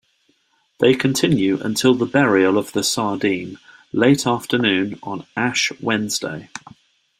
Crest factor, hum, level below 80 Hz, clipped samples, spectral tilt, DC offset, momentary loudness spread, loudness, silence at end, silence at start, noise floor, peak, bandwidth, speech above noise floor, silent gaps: 18 dB; none; -58 dBFS; under 0.1%; -4.5 dB/octave; under 0.1%; 12 LU; -19 LUFS; 0.6 s; 0.8 s; -63 dBFS; -2 dBFS; 16 kHz; 45 dB; none